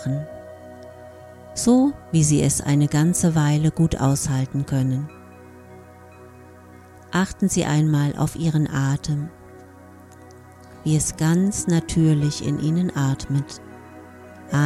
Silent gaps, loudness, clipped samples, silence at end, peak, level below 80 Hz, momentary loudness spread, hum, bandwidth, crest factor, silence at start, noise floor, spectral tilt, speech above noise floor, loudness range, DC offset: none; -21 LUFS; under 0.1%; 0 s; -6 dBFS; -44 dBFS; 22 LU; none; 14 kHz; 16 dB; 0 s; -45 dBFS; -6 dB/octave; 25 dB; 6 LU; under 0.1%